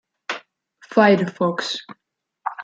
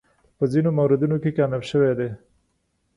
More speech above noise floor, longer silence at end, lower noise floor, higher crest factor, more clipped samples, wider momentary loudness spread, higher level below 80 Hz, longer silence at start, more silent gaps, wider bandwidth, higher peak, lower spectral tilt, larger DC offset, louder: second, 35 dB vs 50 dB; second, 0 s vs 0.8 s; second, -54 dBFS vs -70 dBFS; first, 22 dB vs 16 dB; neither; first, 16 LU vs 8 LU; second, -68 dBFS vs -58 dBFS; about the same, 0.3 s vs 0.4 s; neither; second, 9 kHz vs 11 kHz; first, -2 dBFS vs -6 dBFS; second, -5.5 dB/octave vs -8.5 dB/octave; neither; about the same, -20 LUFS vs -22 LUFS